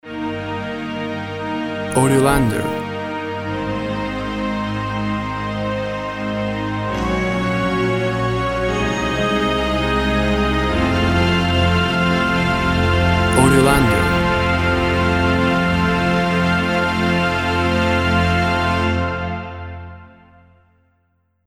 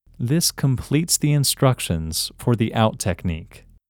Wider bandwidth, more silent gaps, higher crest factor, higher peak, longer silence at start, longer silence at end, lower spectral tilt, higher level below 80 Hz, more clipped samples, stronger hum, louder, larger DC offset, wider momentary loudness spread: second, 16.5 kHz vs 19.5 kHz; neither; about the same, 18 dB vs 18 dB; about the same, 0 dBFS vs -2 dBFS; second, 0.05 s vs 0.2 s; first, 1.4 s vs 0.3 s; about the same, -5.5 dB/octave vs -4.5 dB/octave; first, -32 dBFS vs -42 dBFS; neither; neither; first, -18 LUFS vs -21 LUFS; neither; first, 10 LU vs 7 LU